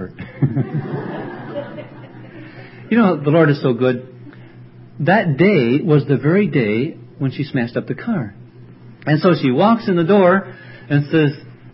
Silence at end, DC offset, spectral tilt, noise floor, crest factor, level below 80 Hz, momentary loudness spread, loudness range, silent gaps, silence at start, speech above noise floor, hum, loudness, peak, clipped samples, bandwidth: 0.05 s; under 0.1%; -12.5 dB/octave; -40 dBFS; 16 dB; -56 dBFS; 21 LU; 4 LU; none; 0 s; 25 dB; none; -17 LUFS; 0 dBFS; under 0.1%; 5.8 kHz